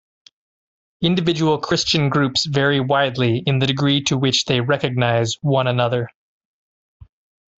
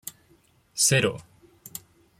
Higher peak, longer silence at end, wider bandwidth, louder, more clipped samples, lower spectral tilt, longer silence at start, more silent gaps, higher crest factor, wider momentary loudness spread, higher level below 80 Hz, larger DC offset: first, -2 dBFS vs -8 dBFS; first, 1.5 s vs 0.4 s; second, 8 kHz vs 16.5 kHz; first, -18 LUFS vs -22 LUFS; neither; first, -5 dB/octave vs -2.5 dB/octave; first, 1 s vs 0.05 s; neither; about the same, 18 dB vs 22 dB; second, 3 LU vs 22 LU; first, -54 dBFS vs -62 dBFS; neither